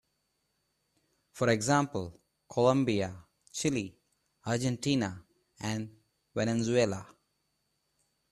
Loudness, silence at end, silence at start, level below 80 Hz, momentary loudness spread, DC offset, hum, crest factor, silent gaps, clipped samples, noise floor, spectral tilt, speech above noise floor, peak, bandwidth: -31 LUFS; 1.25 s; 1.35 s; -66 dBFS; 16 LU; under 0.1%; none; 22 dB; none; under 0.1%; -78 dBFS; -5 dB/octave; 49 dB; -12 dBFS; 13 kHz